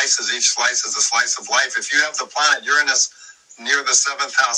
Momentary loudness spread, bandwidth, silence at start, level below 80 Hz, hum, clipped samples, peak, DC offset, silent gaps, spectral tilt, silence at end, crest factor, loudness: 4 LU; 14 kHz; 0 s; -80 dBFS; none; under 0.1%; -2 dBFS; under 0.1%; none; 3.5 dB/octave; 0 s; 18 dB; -17 LUFS